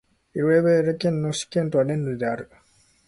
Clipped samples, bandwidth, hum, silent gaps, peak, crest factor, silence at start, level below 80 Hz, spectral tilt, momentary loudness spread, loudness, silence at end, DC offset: under 0.1%; 11.5 kHz; none; none; -8 dBFS; 16 dB; 0.35 s; -58 dBFS; -6 dB/octave; 10 LU; -23 LUFS; 0.65 s; under 0.1%